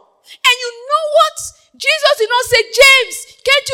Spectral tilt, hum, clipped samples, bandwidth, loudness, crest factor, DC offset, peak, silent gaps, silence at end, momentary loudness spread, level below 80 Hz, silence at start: 1 dB/octave; none; 0.2%; over 20 kHz; -12 LUFS; 14 dB; under 0.1%; 0 dBFS; none; 0 s; 14 LU; -48 dBFS; 0.45 s